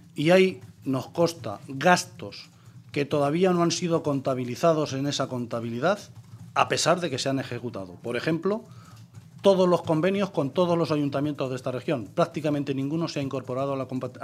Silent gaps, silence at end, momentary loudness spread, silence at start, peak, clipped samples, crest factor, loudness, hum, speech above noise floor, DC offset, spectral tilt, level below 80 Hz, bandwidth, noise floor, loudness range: none; 0 s; 12 LU; 0.15 s; -4 dBFS; under 0.1%; 22 dB; -26 LUFS; none; 22 dB; under 0.1%; -5.5 dB/octave; -70 dBFS; 15 kHz; -47 dBFS; 2 LU